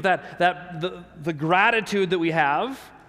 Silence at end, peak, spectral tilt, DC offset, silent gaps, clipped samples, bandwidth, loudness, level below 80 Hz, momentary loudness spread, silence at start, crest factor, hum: 0.1 s; -6 dBFS; -5.5 dB/octave; under 0.1%; none; under 0.1%; 15 kHz; -23 LUFS; -60 dBFS; 13 LU; 0 s; 18 dB; none